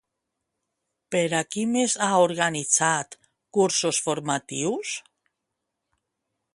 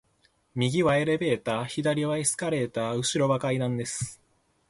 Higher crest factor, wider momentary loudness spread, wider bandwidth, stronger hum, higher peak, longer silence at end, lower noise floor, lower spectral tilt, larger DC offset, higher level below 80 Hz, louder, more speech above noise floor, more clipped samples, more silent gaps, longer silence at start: first, 22 dB vs 16 dB; about the same, 9 LU vs 7 LU; about the same, 11.5 kHz vs 11.5 kHz; neither; first, -6 dBFS vs -10 dBFS; first, 1.55 s vs 0.55 s; first, -82 dBFS vs -67 dBFS; second, -3 dB/octave vs -4.5 dB/octave; neither; second, -72 dBFS vs -60 dBFS; first, -24 LUFS vs -27 LUFS; first, 58 dB vs 41 dB; neither; neither; first, 1.1 s vs 0.55 s